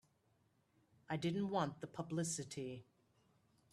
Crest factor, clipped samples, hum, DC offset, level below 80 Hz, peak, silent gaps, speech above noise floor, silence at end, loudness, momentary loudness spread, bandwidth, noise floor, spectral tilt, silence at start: 22 dB; under 0.1%; none; under 0.1%; -80 dBFS; -24 dBFS; none; 36 dB; 0.9 s; -43 LUFS; 10 LU; 13 kHz; -78 dBFS; -5 dB/octave; 1.1 s